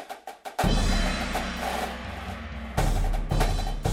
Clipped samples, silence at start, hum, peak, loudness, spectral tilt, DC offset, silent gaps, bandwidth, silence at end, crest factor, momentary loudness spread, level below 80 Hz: under 0.1%; 0 s; none; -10 dBFS; -29 LUFS; -5 dB/octave; under 0.1%; none; 16 kHz; 0 s; 18 dB; 11 LU; -30 dBFS